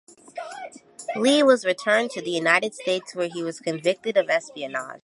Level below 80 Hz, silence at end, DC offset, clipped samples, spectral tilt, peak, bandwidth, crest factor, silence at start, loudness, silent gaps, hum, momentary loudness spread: -78 dBFS; 0.05 s; under 0.1%; under 0.1%; -3.5 dB/octave; -2 dBFS; 11.5 kHz; 22 dB; 0.35 s; -23 LUFS; none; none; 19 LU